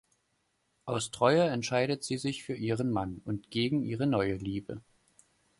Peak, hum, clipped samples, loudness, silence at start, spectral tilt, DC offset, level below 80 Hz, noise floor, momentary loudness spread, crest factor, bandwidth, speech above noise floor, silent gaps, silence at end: -10 dBFS; none; under 0.1%; -31 LUFS; 0.85 s; -5.5 dB/octave; under 0.1%; -60 dBFS; -76 dBFS; 12 LU; 22 dB; 11.5 kHz; 46 dB; none; 0.8 s